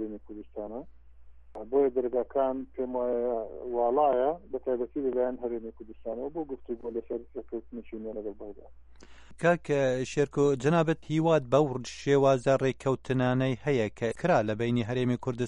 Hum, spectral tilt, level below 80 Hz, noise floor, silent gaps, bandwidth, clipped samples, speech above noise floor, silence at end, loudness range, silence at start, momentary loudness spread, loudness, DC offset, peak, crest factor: none; -7 dB/octave; -56 dBFS; -50 dBFS; none; 11 kHz; under 0.1%; 21 dB; 0 s; 10 LU; 0 s; 15 LU; -29 LUFS; under 0.1%; -10 dBFS; 18 dB